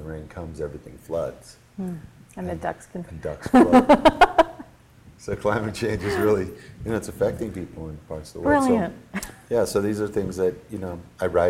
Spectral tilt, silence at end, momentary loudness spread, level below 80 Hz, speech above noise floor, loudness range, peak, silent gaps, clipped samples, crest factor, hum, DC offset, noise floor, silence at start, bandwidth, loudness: -6 dB/octave; 0 s; 20 LU; -44 dBFS; 28 dB; 7 LU; -2 dBFS; none; under 0.1%; 20 dB; none; under 0.1%; -50 dBFS; 0 s; 16 kHz; -22 LUFS